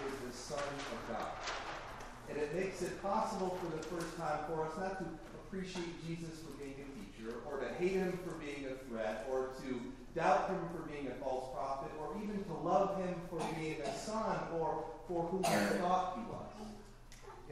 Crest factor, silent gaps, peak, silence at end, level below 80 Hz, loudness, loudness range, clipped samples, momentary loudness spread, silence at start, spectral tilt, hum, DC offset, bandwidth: 20 dB; none; -18 dBFS; 0 s; -58 dBFS; -40 LUFS; 5 LU; under 0.1%; 14 LU; 0 s; -5 dB/octave; none; under 0.1%; 15 kHz